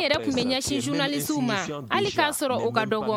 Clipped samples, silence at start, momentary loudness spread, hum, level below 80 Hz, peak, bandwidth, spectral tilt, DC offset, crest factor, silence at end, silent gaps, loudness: under 0.1%; 0 s; 3 LU; none; -56 dBFS; -8 dBFS; 17 kHz; -3.5 dB/octave; under 0.1%; 18 dB; 0 s; none; -25 LUFS